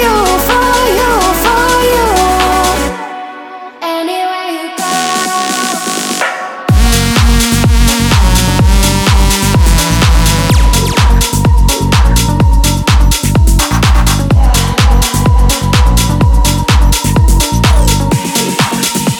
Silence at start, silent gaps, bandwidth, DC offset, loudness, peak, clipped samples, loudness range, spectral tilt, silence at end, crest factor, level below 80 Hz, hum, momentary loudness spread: 0 s; none; 18.5 kHz; under 0.1%; -10 LUFS; 0 dBFS; under 0.1%; 5 LU; -4.5 dB/octave; 0 s; 8 dB; -12 dBFS; none; 6 LU